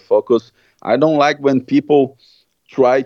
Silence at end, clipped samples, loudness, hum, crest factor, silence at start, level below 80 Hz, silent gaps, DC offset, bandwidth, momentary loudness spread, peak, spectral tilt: 0 s; under 0.1%; -15 LUFS; none; 14 dB; 0.1 s; -68 dBFS; none; under 0.1%; 6.8 kHz; 8 LU; 0 dBFS; -6.5 dB/octave